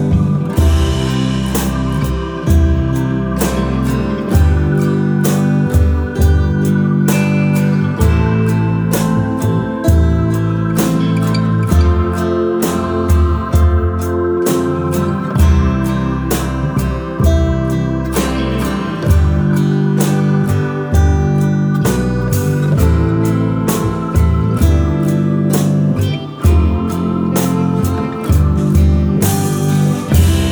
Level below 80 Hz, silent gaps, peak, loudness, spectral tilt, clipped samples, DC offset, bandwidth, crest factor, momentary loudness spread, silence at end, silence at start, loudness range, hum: -20 dBFS; none; 0 dBFS; -14 LUFS; -7 dB/octave; under 0.1%; under 0.1%; over 20 kHz; 12 dB; 4 LU; 0 s; 0 s; 2 LU; none